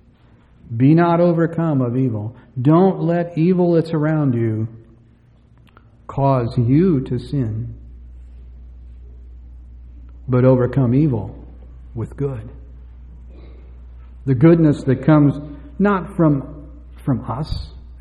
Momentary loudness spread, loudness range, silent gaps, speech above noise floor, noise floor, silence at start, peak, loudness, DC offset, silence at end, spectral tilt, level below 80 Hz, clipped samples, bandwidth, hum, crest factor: 17 LU; 7 LU; none; 34 dB; -50 dBFS; 0.7 s; -2 dBFS; -17 LUFS; under 0.1%; 0 s; -10.5 dB/octave; -38 dBFS; under 0.1%; 5.2 kHz; none; 16 dB